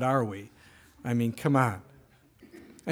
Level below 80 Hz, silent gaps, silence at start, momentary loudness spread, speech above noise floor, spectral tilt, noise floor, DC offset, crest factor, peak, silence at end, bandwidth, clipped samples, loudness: -66 dBFS; none; 0 s; 20 LU; 31 dB; -7.5 dB/octave; -59 dBFS; under 0.1%; 22 dB; -10 dBFS; 0 s; 18 kHz; under 0.1%; -28 LUFS